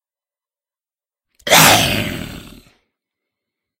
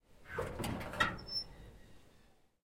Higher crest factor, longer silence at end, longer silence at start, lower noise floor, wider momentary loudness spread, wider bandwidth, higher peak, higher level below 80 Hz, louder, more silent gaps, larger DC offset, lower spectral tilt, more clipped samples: second, 20 dB vs 26 dB; first, 1.3 s vs 0.35 s; first, 1.45 s vs 0.1 s; first, under -90 dBFS vs -66 dBFS; first, 21 LU vs 18 LU; first, over 20 kHz vs 16.5 kHz; first, 0 dBFS vs -16 dBFS; first, -42 dBFS vs -56 dBFS; first, -11 LUFS vs -39 LUFS; neither; neither; second, -2 dB/octave vs -4 dB/octave; neither